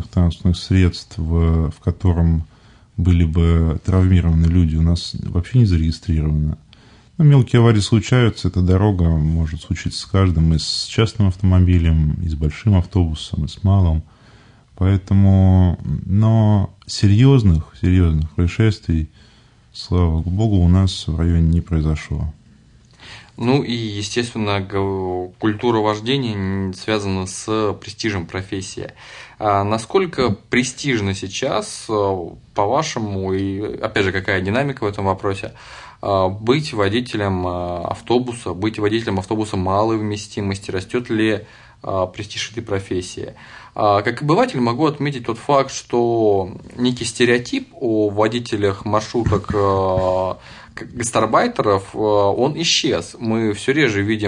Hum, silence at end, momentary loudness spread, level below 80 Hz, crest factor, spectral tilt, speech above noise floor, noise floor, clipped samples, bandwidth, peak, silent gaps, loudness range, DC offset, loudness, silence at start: none; 0 s; 10 LU; -34 dBFS; 16 dB; -6.5 dB/octave; 32 dB; -50 dBFS; under 0.1%; 10.5 kHz; -2 dBFS; none; 5 LU; under 0.1%; -18 LUFS; 0 s